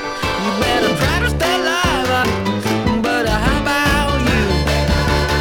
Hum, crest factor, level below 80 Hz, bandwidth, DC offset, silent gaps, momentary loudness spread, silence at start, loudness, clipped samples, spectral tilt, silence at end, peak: none; 14 dB; -24 dBFS; 18.5 kHz; under 0.1%; none; 3 LU; 0 s; -16 LUFS; under 0.1%; -5 dB/octave; 0 s; -2 dBFS